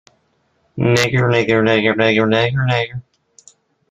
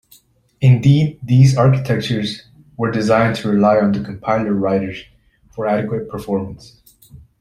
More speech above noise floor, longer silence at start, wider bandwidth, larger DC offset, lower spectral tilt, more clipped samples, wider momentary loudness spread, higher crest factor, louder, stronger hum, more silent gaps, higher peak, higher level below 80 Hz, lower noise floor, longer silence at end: first, 47 dB vs 36 dB; first, 0.75 s vs 0.6 s; first, 14 kHz vs 11.5 kHz; neither; second, -6 dB/octave vs -7.5 dB/octave; neither; second, 9 LU vs 13 LU; about the same, 16 dB vs 14 dB; about the same, -15 LUFS vs -16 LUFS; neither; neither; about the same, 0 dBFS vs -2 dBFS; about the same, -50 dBFS vs -48 dBFS; first, -62 dBFS vs -52 dBFS; first, 0.9 s vs 0.25 s